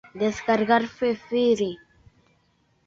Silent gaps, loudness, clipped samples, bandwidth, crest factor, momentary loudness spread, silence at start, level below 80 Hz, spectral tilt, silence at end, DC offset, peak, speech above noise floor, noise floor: none; -24 LUFS; under 0.1%; 7.8 kHz; 20 dB; 8 LU; 0.15 s; -60 dBFS; -5 dB/octave; 1.1 s; under 0.1%; -6 dBFS; 43 dB; -66 dBFS